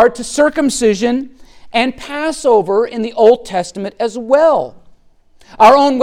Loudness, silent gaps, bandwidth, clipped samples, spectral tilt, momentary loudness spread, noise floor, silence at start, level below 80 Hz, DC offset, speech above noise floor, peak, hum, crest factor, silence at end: -13 LUFS; none; 14.5 kHz; under 0.1%; -4 dB/octave; 12 LU; -47 dBFS; 0 s; -46 dBFS; under 0.1%; 34 dB; 0 dBFS; none; 14 dB; 0 s